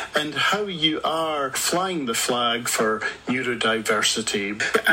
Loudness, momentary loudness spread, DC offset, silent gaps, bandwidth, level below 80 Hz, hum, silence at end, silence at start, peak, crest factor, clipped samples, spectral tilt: -22 LUFS; 4 LU; under 0.1%; none; 16.5 kHz; -60 dBFS; none; 0 s; 0 s; -4 dBFS; 18 dB; under 0.1%; -2 dB/octave